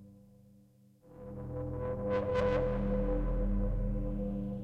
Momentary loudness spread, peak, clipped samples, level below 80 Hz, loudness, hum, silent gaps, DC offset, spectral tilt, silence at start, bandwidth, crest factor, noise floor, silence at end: 11 LU; -20 dBFS; under 0.1%; -38 dBFS; -35 LUFS; none; none; under 0.1%; -9 dB/octave; 0 s; 5.8 kHz; 14 dB; -63 dBFS; 0 s